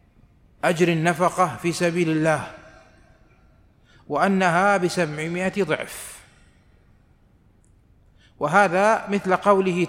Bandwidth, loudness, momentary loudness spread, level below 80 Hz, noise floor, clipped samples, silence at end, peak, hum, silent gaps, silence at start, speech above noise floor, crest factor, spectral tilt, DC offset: 16 kHz; -21 LUFS; 9 LU; -58 dBFS; -57 dBFS; under 0.1%; 0 s; -4 dBFS; none; none; 0.65 s; 36 dB; 20 dB; -5.5 dB/octave; under 0.1%